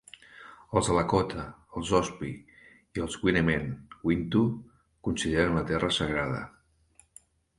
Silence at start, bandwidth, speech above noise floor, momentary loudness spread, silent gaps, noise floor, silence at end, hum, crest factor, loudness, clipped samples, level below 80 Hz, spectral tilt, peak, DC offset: 0.35 s; 11.5 kHz; 35 dB; 16 LU; none; -63 dBFS; 1.1 s; none; 22 dB; -29 LUFS; under 0.1%; -48 dBFS; -5.5 dB/octave; -8 dBFS; under 0.1%